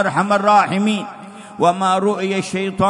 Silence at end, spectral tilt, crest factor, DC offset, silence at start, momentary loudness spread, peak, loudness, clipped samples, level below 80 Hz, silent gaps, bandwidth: 0 s; -5.5 dB/octave; 14 dB; under 0.1%; 0 s; 15 LU; -2 dBFS; -17 LUFS; under 0.1%; -56 dBFS; none; 11 kHz